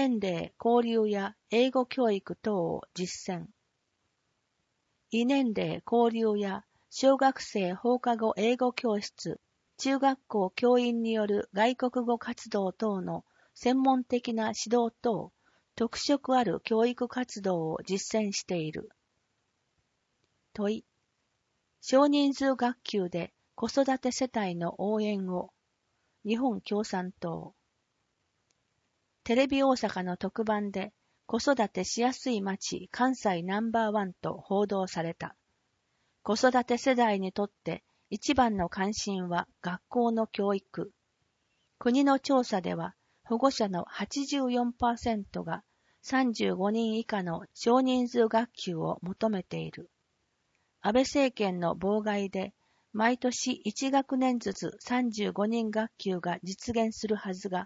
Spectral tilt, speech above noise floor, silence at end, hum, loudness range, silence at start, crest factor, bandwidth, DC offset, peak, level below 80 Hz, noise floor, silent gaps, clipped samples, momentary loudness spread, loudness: -5 dB/octave; 49 dB; 0 s; none; 5 LU; 0 s; 20 dB; 8 kHz; under 0.1%; -10 dBFS; -64 dBFS; -78 dBFS; none; under 0.1%; 11 LU; -30 LUFS